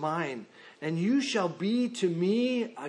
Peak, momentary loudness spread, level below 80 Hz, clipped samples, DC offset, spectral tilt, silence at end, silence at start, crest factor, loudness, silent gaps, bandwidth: -14 dBFS; 9 LU; -84 dBFS; under 0.1%; under 0.1%; -5.5 dB/octave; 0 s; 0 s; 14 dB; -29 LUFS; none; 10 kHz